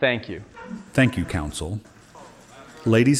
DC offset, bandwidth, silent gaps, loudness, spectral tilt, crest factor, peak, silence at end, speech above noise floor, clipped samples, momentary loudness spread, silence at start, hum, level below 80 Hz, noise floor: under 0.1%; 14 kHz; none; -24 LUFS; -5.5 dB/octave; 16 dB; -6 dBFS; 0 s; 25 dB; under 0.1%; 25 LU; 0 s; none; -44 dBFS; -46 dBFS